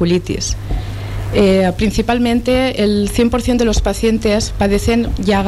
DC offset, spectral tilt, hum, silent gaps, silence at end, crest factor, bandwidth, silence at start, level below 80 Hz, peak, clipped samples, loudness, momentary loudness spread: under 0.1%; -5.5 dB/octave; none; none; 0 s; 10 dB; 14.5 kHz; 0 s; -24 dBFS; -4 dBFS; under 0.1%; -15 LUFS; 7 LU